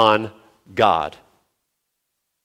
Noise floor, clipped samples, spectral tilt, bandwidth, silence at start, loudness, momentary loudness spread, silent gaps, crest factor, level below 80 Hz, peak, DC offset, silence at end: -76 dBFS; under 0.1%; -5.5 dB/octave; 15 kHz; 0 s; -20 LUFS; 14 LU; none; 20 dB; -56 dBFS; -2 dBFS; under 0.1%; 1.35 s